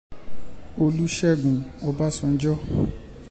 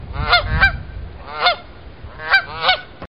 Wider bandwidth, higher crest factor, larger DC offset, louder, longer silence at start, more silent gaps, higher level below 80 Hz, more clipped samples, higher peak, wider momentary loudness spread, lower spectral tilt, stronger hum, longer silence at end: second, 9 kHz vs 11.5 kHz; second, 14 dB vs 20 dB; second, under 0.1% vs 0.7%; second, -24 LUFS vs -16 LUFS; about the same, 0.1 s vs 0 s; neither; second, -42 dBFS vs -30 dBFS; neither; second, -10 dBFS vs 0 dBFS; second, 8 LU vs 18 LU; about the same, -6.5 dB/octave vs -5.5 dB/octave; neither; about the same, 0 s vs 0.05 s